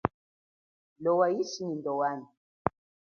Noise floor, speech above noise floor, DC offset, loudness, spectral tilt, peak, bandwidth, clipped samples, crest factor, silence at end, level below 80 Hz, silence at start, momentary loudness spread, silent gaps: under -90 dBFS; over 61 dB; under 0.1%; -31 LUFS; -5.5 dB/octave; -6 dBFS; 7 kHz; under 0.1%; 26 dB; 0.35 s; -60 dBFS; 0.05 s; 9 LU; 0.14-0.96 s, 2.37-2.65 s